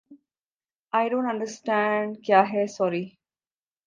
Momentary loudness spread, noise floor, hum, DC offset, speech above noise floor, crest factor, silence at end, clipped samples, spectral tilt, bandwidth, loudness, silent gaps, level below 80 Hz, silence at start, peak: 9 LU; under -90 dBFS; none; under 0.1%; over 66 dB; 22 dB; 0.8 s; under 0.1%; -5.5 dB/octave; 9.6 kHz; -25 LUFS; 0.46-0.60 s, 0.74-0.83 s; -78 dBFS; 0.1 s; -6 dBFS